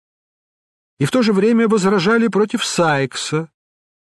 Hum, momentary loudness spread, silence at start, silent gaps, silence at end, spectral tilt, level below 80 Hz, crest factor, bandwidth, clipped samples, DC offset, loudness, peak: none; 8 LU; 1 s; none; 0.55 s; -5 dB/octave; -60 dBFS; 14 dB; 12.5 kHz; under 0.1%; under 0.1%; -16 LUFS; -4 dBFS